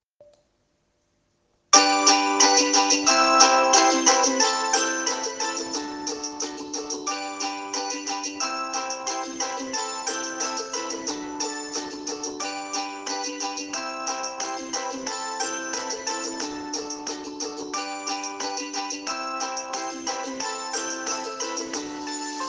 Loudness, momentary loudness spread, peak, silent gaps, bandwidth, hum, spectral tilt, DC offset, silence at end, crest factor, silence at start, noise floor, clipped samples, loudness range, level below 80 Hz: -24 LUFS; 14 LU; 0 dBFS; none; 10.5 kHz; none; 0.5 dB/octave; under 0.1%; 0 s; 26 dB; 0.2 s; -70 dBFS; under 0.1%; 12 LU; -70 dBFS